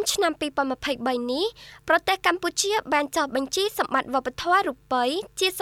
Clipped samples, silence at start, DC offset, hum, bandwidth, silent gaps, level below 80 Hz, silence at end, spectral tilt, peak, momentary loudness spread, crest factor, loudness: under 0.1%; 0 s; under 0.1%; none; 17.5 kHz; none; -56 dBFS; 0 s; -1.5 dB/octave; -8 dBFS; 4 LU; 16 dB; -24 LUFS